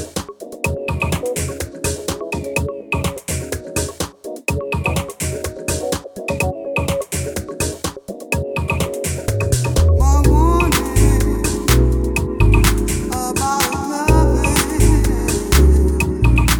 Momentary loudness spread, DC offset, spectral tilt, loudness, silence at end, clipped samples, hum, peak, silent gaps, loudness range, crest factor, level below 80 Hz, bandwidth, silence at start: 10 LU; under 0.1%; -5 dB/octave; -18 LUFS; 0 s; under 0.1%; none; 0 dBFS; none; 7 LU; 16 dB; -20 dBFS; over 20 kHz; 0 s